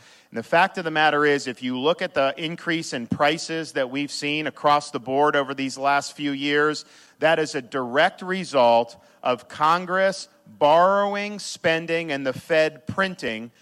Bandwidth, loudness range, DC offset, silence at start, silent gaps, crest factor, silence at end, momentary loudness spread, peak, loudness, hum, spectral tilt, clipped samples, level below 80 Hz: 13 kHz; 3 LU; under 0.1%; 0.3 s; none; 18 dB; 0.15 s; 10 LU; -6 dBFS; -22 LUFS; none; -4 dB/octave; under 0.1%; -70 dBFS